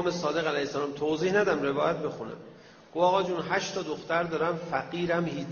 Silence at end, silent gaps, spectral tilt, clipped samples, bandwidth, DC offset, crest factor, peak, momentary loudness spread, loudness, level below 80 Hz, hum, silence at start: 0 s; none; -4 dB/octave; under 0.1%; 7 kHz; under 0.1%; 18 dB; -12 dBFS; 9 LU; -28 LUFS; -64 dBFS; none; 0 s